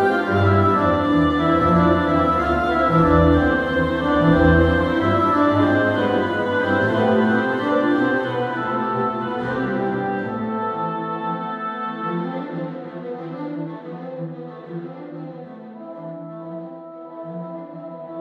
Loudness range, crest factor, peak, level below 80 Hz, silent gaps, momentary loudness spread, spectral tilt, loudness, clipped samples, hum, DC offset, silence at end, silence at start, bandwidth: 17 LU; 18 dB; -2 dBFS; -36 dBFS; none; 18 LU; -8.5 dB/octave; -19 LUFS; under 0.1%; none; under 0.1%; 0 s; 0 s; 7.8 kHz